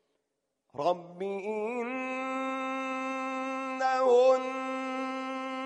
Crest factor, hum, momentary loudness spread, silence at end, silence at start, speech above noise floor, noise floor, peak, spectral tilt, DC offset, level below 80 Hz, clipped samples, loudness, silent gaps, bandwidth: 18 dB; none; 11 LU; 0 s; 0.75 s; 49 dB; -82 dBFS; -12 dBFS; -4.5 dB/octave; under 0.1%; -88 dBFS; under 0.1%; -30 LUFS; none; 9.4 kHz